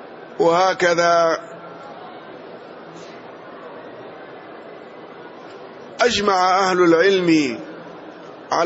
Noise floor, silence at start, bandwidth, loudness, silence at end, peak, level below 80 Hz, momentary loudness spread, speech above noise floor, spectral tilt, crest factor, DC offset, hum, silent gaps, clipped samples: -38 dBFS; 0 s; 8 kHz; -17 LUFS; 0 s; -4 dBFS; -60 dBFS; 23 LU; 22 dB; -4 dB/octave; 16 dB; under 0.1%; none; none; under 0.1%